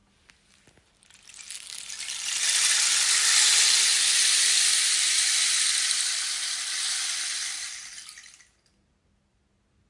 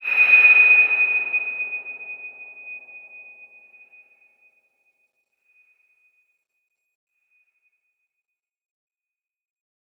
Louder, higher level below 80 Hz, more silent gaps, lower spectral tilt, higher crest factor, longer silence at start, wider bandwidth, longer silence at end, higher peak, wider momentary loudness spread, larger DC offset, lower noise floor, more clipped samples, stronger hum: second, -21 LUFS vs -14 LUFS; first, -74 dBFS vs under -90 dBFS; neither; second, 5 dB/octave vs -2 dB/octave; about the same, 20 dB vs 20 dB; first, 1.35 s vs 0 s; second, 11.5 kHz vs 13 kHz; second, 1.7 s vs 6.8 s; about the same, -6 dBFS vs -4 dBFS; second, 19 LU vs 27 LU; neither; second, -69 dBFS vs under -90 dBFS; neither; neither